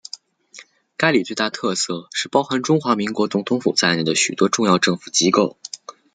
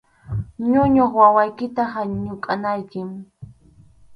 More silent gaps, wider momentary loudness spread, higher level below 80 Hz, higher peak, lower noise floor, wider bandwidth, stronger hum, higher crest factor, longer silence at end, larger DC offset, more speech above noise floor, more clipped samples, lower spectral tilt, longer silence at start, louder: neither; second, 14 LU vs 17 LU; second, -64 dBFS vs -46 dBFS; about the same, -2 dBFS vs 0 dBFS; second, -46 dBFS vs -50 dBFS; first, 9.6 kHz vs 5.6 kHz; neither; about the same, 20 dB vs 20 dB; first, 0.25 s vs 0 s; neither; second, 27 dB vs 32 dB; neither; second, -3.5 dB/octave vs -9.5 dB/octave; about the same, 0.15 s vs 0.25 s; about the same, -19 LUFS vs -19 LUFS